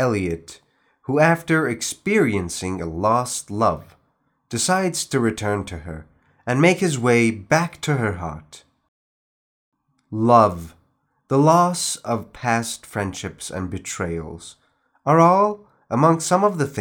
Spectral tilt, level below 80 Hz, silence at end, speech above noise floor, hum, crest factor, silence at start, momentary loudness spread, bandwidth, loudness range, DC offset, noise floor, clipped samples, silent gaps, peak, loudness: -5 dB/octave; -54 dBFS; 0 s; 47 dB; none; 20 dB; 0 s; 17 LU; 18.5 kHz; 4 LU; under 0.1%; -67 dBFS; under 0.1%; 8.88-9.72 s; -2 dBFS; -20 LUFS